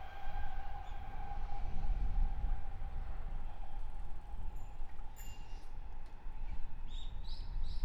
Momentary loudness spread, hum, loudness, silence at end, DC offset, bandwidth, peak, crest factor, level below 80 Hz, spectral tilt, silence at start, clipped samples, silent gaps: 11 LU; none; -47 LUFS; 0 s; under 0.1%; 7.6 kHz; -22 dBFS; 12 dB; -40 dBFS; -5.5 dB/octave; 0 s; under 0.1%; none